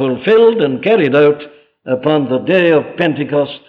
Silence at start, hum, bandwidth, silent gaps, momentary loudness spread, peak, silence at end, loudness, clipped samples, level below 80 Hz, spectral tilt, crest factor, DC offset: 0 s; none; 5 kHz; none; 7 LU; 0 dBFS; 0.1 s; -13 LUFS; under 0.1%; -60 dBFS; -8.5 dB/octave; 12 dB; under 0.1%